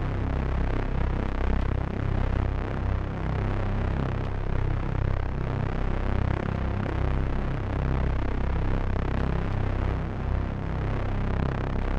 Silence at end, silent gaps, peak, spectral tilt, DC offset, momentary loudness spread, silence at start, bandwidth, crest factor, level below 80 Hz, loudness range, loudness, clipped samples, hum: 0 s; none; -10 dBFS; -8.5 dB/octave; under 0.1%; 2 LU; 0 s; 6.2 kHz; 16 dB; -28 dBFS; 1 LU; -29 LUFS; under 0.1%; none